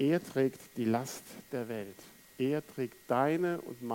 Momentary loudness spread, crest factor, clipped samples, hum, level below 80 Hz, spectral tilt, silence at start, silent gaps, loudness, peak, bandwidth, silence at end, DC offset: 13 LU; 18 dB; under 0.1%; none; -76 dBFS; -6 dB/octave; 0 s; none; -34 LUFS; -16 dBFS; 17 kHz; 0 s; under 0.1%